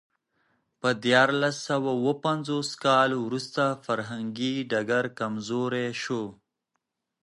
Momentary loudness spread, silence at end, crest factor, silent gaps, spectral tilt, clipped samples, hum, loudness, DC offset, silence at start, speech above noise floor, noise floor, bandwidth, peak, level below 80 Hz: 9 LU; 0.9 s; 22 dB; none; -5 dB/octave; under 0.1%; none; -26 LUFS; under 0.1%; 0.85 s; 55 dB; -81 dBFS; 11.5 kHz; -6 dBFS; -74 dBFS